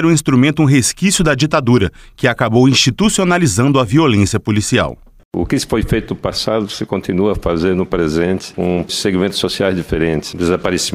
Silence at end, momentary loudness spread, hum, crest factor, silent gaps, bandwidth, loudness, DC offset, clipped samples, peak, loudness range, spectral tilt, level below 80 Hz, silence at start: 0 s; 7 LU; none; 14 dB; 5.25-5.31 s; 16 kHz; -14 LUFS; under 0.1%; under 0.1%; 0 dBFS; 5 LU; -5 dB/octave; -34 dBFS; 0 s